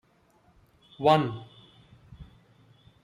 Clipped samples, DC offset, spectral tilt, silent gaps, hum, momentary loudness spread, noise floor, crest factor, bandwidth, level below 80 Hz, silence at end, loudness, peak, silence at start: under 0.1%; under 0.1%; -7 dB/octave; none; none; 28 LU; -64 dBFS; 24 dB; 15 kHz; -60 dBFS; 0.8 s; -25 LUFS; -8 dBFS; 1 s